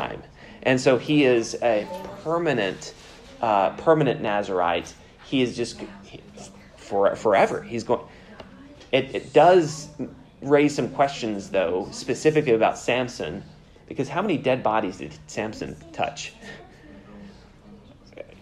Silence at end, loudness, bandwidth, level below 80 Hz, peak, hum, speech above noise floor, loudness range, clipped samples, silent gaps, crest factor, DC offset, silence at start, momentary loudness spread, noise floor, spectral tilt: 0.2 s; -23 LUFS; 12.5 kHz; -56 dBFS; -4 dBFS; none; 25 dB; 6 LU; under 0.1%; none; 20 dB; under 0.1%; 0 s; 20 LU; -48 dBFS; -5 dB/octave